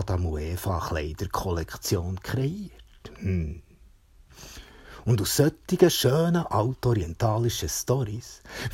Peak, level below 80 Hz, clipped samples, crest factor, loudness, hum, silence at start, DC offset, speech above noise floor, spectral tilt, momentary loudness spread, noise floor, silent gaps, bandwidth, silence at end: -6 dBFS; -42 dBFS; under 0.1%; 22 dB; -26 LUFS; none; 0 s; under 0.1%; 29 dB; -5.5 dB/octave; 19 LU; -55 dBFS; none; 16.5 kHz; 0 s